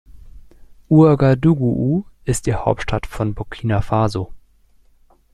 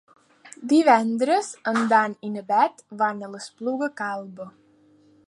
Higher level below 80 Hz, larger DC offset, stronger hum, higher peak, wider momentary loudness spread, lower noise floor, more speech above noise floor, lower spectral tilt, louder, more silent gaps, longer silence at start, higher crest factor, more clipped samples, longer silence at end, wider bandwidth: first, -36 dBFS vs -80 dBFS; neither; neither; about the same, -2 dBFS vs -2 dBFS; second, 12 LU vs 18 LU; second, -53 dBFS vs -57 dBFS; about the same, 37 dB vs 35 dB; first, -7.5 dB/octave vs -4.5 dB/octave; first, -18 LUFS vs -23 LUFS; neither; second, 0.15 s vs 0.45 s; second, 16 dB vs 22 dB; neither; first, 0.95 s vs 0.8 s; first, 13 kHz vs 11.5 kHz